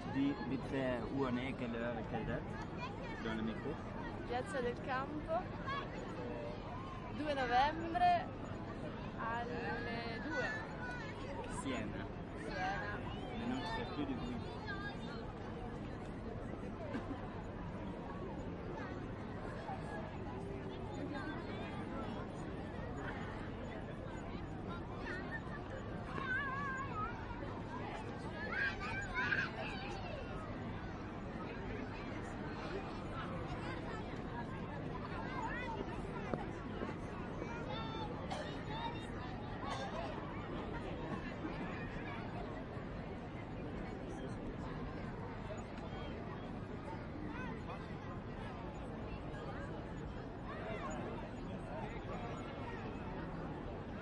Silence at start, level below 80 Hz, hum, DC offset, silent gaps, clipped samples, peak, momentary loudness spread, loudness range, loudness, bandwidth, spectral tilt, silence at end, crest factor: 0 s; -54 dBFS; none; under 0.1%; none; under 0.1%; -20 dBFS; 8 LU; 7 LU; -43 LUFS; 11 kHz; -6.5 dB/octave; 0 s; 24 dB